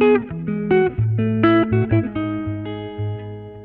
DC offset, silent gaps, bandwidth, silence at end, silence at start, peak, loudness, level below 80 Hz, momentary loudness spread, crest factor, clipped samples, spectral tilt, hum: under 0.1%; none; 4.2 kHz; 0 s; 0 s; -4 dBFS; -20 LUFS; -44 dBFS; 12 LU; 14 dB; under 0.1%; -11.5 dB/octave; none